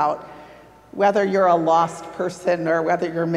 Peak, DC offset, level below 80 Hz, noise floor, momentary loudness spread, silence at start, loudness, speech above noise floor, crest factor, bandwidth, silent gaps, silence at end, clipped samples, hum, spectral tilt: -4 dBFS; under 0.1%; -62 dBFS; -45 dBFS; 12 LU; 0 s; -20 LUFS; 26 dB; 16 dB; 12.5 kHz; none; 0 s; under 0.1%; none; -6 dB/octave